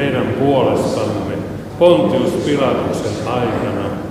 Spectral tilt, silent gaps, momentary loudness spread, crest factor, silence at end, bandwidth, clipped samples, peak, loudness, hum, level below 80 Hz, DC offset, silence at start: -6.5 dB/octave; none; 9 LU; 16 dB; 0 s; 15 kHz; under 0.1%; 0 dBFS; -16 LUFS; none; -42 dBFS; under 0.1%; 0 s